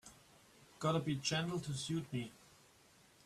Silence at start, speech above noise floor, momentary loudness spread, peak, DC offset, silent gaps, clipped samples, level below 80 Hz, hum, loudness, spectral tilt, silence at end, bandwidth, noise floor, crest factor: 0.05 s; 28 dB; 10 LU; -22 dBFS; under 0.1%; none; under 0.1%; -70 dBFS; none; -39 LUFS; -4.5 dB/octave; 0.9 s; 14 kHz; -67 dBFS; 20 dB